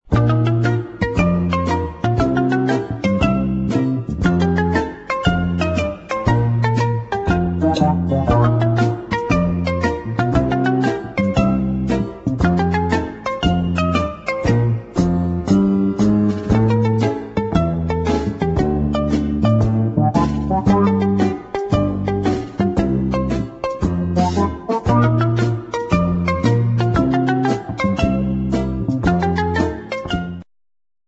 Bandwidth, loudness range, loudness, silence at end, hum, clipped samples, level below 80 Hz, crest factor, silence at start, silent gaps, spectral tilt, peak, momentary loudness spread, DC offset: 8 kHz; 2 LU; -18 LUFS; 0.65 s; none; under 0.1%; -32 dBFS; 16 dB; 0.1 s; none; -8 dB/octave; -2 dBFS; 5 LU; under 0.1%